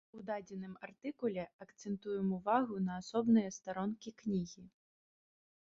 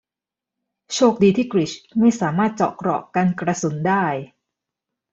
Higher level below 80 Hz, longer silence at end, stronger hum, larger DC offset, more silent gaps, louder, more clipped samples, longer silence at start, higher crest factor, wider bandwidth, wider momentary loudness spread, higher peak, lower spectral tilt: second, -74 dBFS vs -60 dBFS; first, 1.1 s vs 0.85 s; neither; neither; first, 1.53-1.59 s vs none; second, -38 LUFS vs -20 LUFS; neither; second, 0.15 s vs 0.9 s; about the same, 20 dB vs 18 dB; about the same, 7.6 kHz vs 8 kHz; first, 16 LU vs 8 LU; second, -18 dBFS vs -2 dBFS; about the same, -6.5 dB/octave vs -6 dB/octave